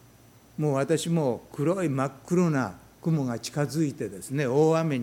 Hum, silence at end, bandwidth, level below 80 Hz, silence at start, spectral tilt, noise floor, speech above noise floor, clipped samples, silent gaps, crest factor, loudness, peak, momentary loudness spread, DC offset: none; 0 s; 16 kHz; -64 dBFS; 0.6 s; -6.5 dB/octave; -55 dBFS; 29 dB; under 0.1%; none; 16 dB; -27 LUFS; -10 dBFS; 8 LU; under 0.1%